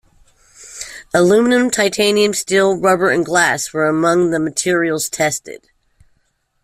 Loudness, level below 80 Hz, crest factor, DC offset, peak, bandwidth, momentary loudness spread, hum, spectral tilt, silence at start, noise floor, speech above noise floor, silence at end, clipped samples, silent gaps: -15 LUFS; -54 dBFS; 14 dB; under 0.1%; -2 dBFS; 16 kHz; 13 LU; none; -3.5 dB/octave; 0.6 s; -64 dBFS; 49 dB; 1.05 s; under 0.1%; none